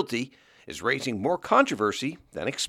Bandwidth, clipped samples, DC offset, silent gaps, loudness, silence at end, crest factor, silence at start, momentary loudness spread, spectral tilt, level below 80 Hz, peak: 15.5 kHz; under 0.1%; under 0.1%; none; -26 LUFS; 0 s; 20 dB; 0 s; 12 LU; -4 dB/octave; -64 dBFS; -8 dBFS